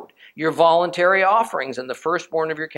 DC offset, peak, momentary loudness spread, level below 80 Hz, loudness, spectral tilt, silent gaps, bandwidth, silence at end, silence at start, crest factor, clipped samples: under 0.1%; -2 dBFS; 10 LU; -72 dBFS; -19 LUFS; -4.5 dB/octave; none; 13 kHz; 0.05 s; 0 s; 18 dB; under 0.1%